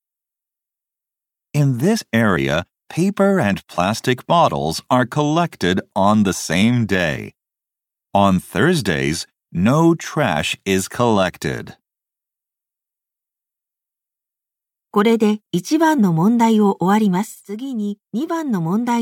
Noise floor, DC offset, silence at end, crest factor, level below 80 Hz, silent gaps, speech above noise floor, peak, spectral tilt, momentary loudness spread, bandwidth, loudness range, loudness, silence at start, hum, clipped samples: -87 dBFS; under 0.1%; 0 s; 16 dB; -50 dBFS; none; 69 dB; -2 dBFS; -5.5 dB/octave; 10 LU; 16.5 kHz; 6 LU; -18 LUFS; 1.55 s; none; under 0.1%